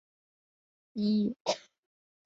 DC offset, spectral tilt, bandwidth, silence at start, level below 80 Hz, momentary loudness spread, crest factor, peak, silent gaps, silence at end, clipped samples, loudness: under 0.1%; -5.5 dB/octave; 7.8 kHz; 0.95 s; -78 dBFS; 9 LU; 20 dB; -16 dBFS; 1.40-1.45 s; 0.65 s; under 0.1%; -32 LUFS